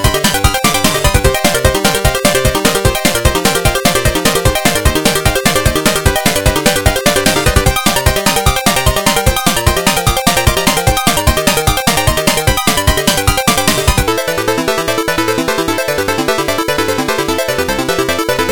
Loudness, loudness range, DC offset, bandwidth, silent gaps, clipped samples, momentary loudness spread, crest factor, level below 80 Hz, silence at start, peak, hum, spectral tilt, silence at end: -12 LUFS; 3 LU; under 0.1%; 18.5 kHz; none; 0.2%; 3 LU; 12 dB; -22 dBFS; 0 s; 0 dBFS; none; -3.5 dB/octave; 0 s